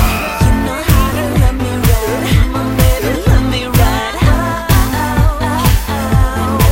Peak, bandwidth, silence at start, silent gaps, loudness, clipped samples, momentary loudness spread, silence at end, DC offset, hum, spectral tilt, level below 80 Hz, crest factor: 0 dBFS; 16.5 kHz; 0 s; none; -13 LUFS; under 0.1%; 2 LU; 0 s; 0.4%; none; -5.5 dB/octave; -16 dBFS; 12 dB